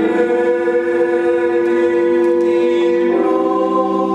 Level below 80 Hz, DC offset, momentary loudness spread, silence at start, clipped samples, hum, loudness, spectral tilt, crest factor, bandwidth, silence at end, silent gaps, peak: -60 dBFS; under 0.1%; 2 LU; 0 s; under 0.1%; none; -15 LUFS; -7 dB/octave; 12 dB; 8.6 kHz; 0 s; none; -2 dBFS